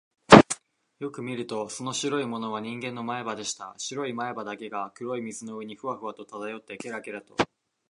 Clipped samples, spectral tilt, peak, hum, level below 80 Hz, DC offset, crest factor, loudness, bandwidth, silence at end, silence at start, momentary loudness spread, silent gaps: under 0.1%; -4.5 dB/octave; 0 dBFS; none; -56 dBFS; under 0.1%; 26 dB; -26 LUFS; 11 kHz; 0.45 s; 0.3 s; 13 LU; none